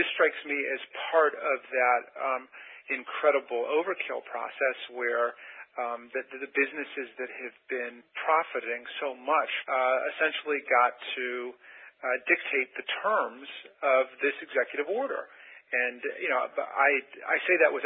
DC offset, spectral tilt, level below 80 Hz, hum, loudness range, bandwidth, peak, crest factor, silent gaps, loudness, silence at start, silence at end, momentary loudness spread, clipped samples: under 0.1%; -6 dB/octave; -88 dBFS; none; 4 LU; 4 kHz; -10 dBFS; 20 dB; none; -29 LUFS; 0 s; 0 s; 12 LU; under 0.1%